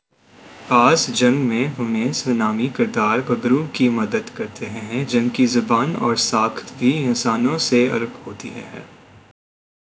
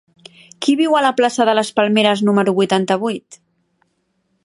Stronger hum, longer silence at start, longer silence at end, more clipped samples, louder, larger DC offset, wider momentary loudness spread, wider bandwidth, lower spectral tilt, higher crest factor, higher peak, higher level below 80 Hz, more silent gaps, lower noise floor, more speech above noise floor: neither; second, 0.45 s vs 0.6 s; about the same, 1.05 s vs 1.1 s; neither; second, -19 LUFS vs -16 LUFS; neither; first, 14 LU vs 6 LU; second, 8 kHz vs 11.5 kHz; about the same, -4.5 dB/octave vs -5 dB/octave; about the same, 20 dB vs 16 dB; about the same, 0 dBFS vs 0 dBFS; first, -60 dBFS vs -68 dBFS; neither; second, -48 dBFS vs -67 dBFS; second, 29 dB vs 51 dB